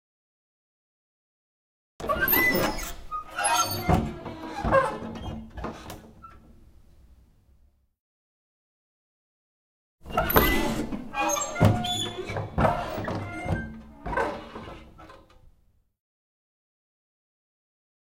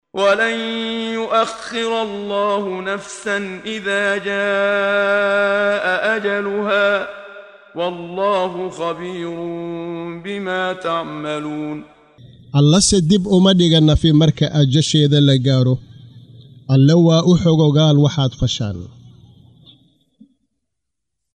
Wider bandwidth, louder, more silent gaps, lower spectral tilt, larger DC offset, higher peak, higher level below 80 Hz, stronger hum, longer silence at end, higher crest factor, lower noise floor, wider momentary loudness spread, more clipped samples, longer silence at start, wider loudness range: first, 16 kHz vs 11 kHz; second, -26 LUFS vs -17 LUFS; first, 8.00-9.98 s vs none; about the same, -4.5 dB/octave vs -5.5 dB/octave; neither; about the same, 0 dBFS vs -2 dBFS; about the same, -42 dBFS vs -42 dBFS; neither; first, 2.55 s vs 2.3 s; first, 30 dB vs 14 dB; second, -63 dBFS vs -80 dBFS; first, 17 LU vs 13 LU; neither; first, 2 s vs 0.15 s; about the same, 12 LU vs 10 LU